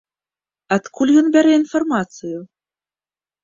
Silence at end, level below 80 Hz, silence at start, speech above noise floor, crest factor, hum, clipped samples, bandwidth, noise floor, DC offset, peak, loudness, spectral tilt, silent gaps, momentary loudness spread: 1 s; -62 dBFS; 0.7 s; over 74 dB; 16 dB; none; under 0.1%; 7.6 kHz; under -90 dBFS; under 0.1%; -2 dBFS; -16 LUFS; -5.5 dB/octave; none; 17 LU